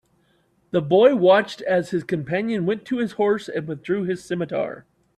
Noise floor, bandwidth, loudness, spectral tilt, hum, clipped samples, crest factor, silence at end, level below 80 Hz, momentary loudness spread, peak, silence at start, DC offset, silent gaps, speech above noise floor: -63 dBFS; 11.5 kHz; -22 LUFS; -7 dB/octave; none; under 0.1%; 18 dB; 0.35 s; -64 dBFS; 11 LU; -4 dBFS; 0.75 s; under 0.1%; none; 43 dB